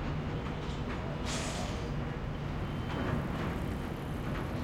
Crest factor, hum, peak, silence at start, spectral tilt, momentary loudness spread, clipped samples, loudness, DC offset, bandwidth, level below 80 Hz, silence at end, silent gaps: 16 dB; none; -20 dBFS; 0 s; -5.5 dB/octave; 4 LU; under 0.1%; -36 LUFS; under 0.1%; 16 kHz; -44 dBFS; 0 s; none